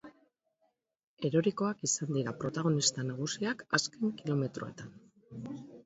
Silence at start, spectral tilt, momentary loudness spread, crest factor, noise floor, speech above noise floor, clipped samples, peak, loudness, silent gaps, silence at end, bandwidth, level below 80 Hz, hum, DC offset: 0.05 s; -4 dB/octave; 15 LU; 22 dB; -80 dBFS; 47 dB; under 0.1%; -12 dBFS; -33 LUFS; 1.04-1.17 s; 0.05 s; 8 kHz; -72 dBFS; none; under 0.1%